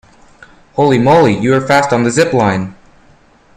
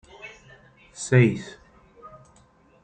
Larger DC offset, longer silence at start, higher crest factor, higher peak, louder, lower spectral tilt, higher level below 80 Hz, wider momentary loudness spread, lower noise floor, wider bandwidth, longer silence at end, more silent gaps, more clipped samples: neither; first, 0.75 s vs 0.25 s; second, 14 dB vs 22 dB; first, 0 dBFS vs -6 dBFS; first, -11 LUFS vs -22 LUFS; about the same, -6 dB/octave vs -6.5 dB/octave; first, -46 dBFS vs -60 dBFS; second, 10 LU vs 24 LU; second, -46 dBFS vs -57 dBFS; first, 14.5 kHz vs 9.4 kHz; about the same, 0.85 s vs 0.75 s; neither; neither